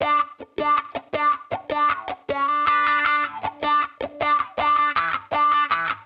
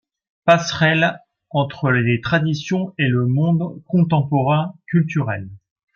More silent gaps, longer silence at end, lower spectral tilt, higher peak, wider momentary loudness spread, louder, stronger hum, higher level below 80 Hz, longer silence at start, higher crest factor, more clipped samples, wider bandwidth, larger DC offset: neither; second, 0 s vs 0.4 s; about the same, -5.5 dB/octave vs -6.5 dB/octave; second, -6 dBFS vs -2 dBFS; about the same, 9 LU vs 7 LU; second, -22 LUFS vs -19 LUFS; neither; about the same, -58 dBFS vs -56 dBFS; second, 0 s vs 0.45 s; about the same, 16 dB vs 18 dB; neither; second, 5.4 kHz vs 7.2 kHz; neither